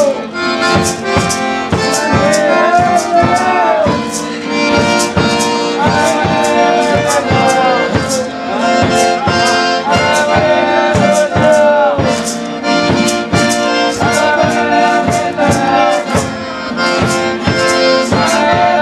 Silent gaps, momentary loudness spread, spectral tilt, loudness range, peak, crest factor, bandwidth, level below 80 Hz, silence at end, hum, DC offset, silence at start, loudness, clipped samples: none; 5 LU; -4 dB/octave; 2 LU; 0 dBFS; 12 dB; 14.5 kHz; -38 dBFS; 0 s; none; under 0.1%; 0 s; -11 LUFS; under 0.1%